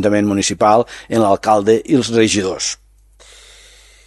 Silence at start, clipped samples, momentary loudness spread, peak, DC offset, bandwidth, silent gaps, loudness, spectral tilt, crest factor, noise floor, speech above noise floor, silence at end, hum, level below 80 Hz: 0 s; under 0.1%; 7 LU; 0 dBFS; under 0.1%; 12.5 kHz; none; -15 LUFS; -4.5 dB/octave; 16 dB; -46 dBFS; 32 dB; 1.35 s; 50 Hz at -45 dBFS; -46 dBFS